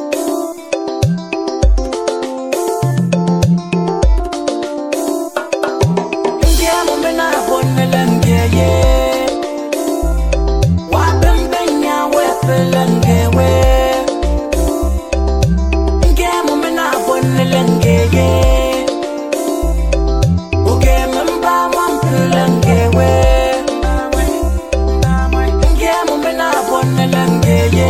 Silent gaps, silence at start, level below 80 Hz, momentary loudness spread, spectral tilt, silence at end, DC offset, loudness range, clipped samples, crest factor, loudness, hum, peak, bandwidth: none; 0 s; -18 dBFS; 7 LU; -6 dB/octave; 0 s; under 0.1%; 3 LU; under 0.1%; 12 dB; -14 LUFS; none; 0 dBFS; 16.5 kHz